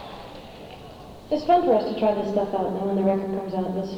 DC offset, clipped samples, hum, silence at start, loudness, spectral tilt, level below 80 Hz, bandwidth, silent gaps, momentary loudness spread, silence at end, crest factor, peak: under 0.1%; under 0.1%; none; 0 s; -24 LUFS; -8 dB/octave; -52 dBFS; 14 kHz; none; 21 LU; 0 s; 18 dB; -8 dBFS